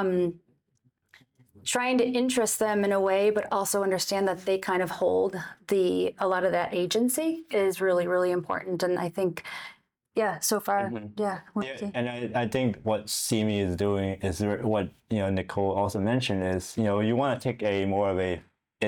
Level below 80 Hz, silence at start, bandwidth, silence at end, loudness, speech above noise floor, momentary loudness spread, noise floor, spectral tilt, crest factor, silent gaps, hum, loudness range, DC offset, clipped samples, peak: -62 dBFS; 0 s; over 20 kHz; 0 s; -27 LUFS; 44 dB; 7 LU; -71 dBFS; -4.5 dB/octave; 14 dB; none; none; 4 LU; under 0.1%; under 0.1%; -12 dBFS